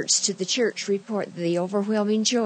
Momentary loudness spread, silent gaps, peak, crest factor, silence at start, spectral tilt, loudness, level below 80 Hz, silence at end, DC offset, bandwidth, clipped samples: 6 LU; none; -8 dBFS; 16 dB; 0 s; -3 dB/octave; -24 LUFS; under -90 dBFS; 0 s; under 0.1%; 9.2 kHz; under 0.1%